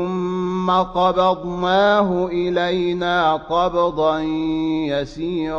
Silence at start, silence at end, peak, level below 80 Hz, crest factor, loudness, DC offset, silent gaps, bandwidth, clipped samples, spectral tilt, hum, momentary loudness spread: 0 s; 0 s; -6 dBFS; -44 dBFS; 14 dB; -19 LUFS; under 0.1%; none; 7.2 kHz; under 0.1%; -6.5 dB/octave; none; 6 LU